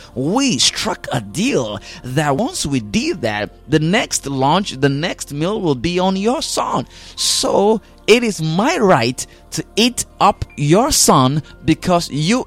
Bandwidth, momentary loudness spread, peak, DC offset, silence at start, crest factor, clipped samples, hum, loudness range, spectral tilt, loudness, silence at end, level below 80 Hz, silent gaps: 16.5 kHz; 9 LU; 0 dBFS; under 0.1%; 0 s; 16 dB; under 0.1%; none; 3 LU; -4 dB/octave; -16 LUFS; 0 s; -40 dBFS; none